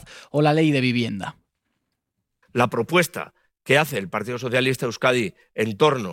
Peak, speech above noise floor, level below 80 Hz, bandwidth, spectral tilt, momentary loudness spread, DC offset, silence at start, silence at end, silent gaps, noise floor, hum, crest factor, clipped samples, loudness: -4 dBFS; 57 dB; -64 dBFS; 16.5 kHz; -5.5 dB/octave; 11 LU; under 0.1%; 0.1 s; 0 s; none; -78 dBFS; none; 18 dB; under 0.1%; -22 LUFS